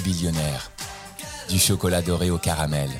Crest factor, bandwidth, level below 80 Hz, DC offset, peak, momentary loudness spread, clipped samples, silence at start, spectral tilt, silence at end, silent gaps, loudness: 18 dB; 19.5 kHz; -40 dBFS; under 0.1%; -6 dBFS; 15 LU; under 0.1%; 0 s; -4 dB/octave; 0 s; none; -23 LUFS